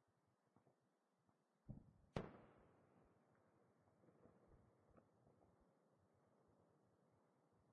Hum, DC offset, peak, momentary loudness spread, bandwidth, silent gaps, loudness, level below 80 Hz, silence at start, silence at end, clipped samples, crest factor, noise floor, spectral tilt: none; under 0.1%; -32 dBFS; 10 LU; 3.3 kHz; none; -58 LUFS; -78 dBFS; 0 s; 0 s; under 0.1%; 34 dB; -86 dBFS; -5.5 dB/octave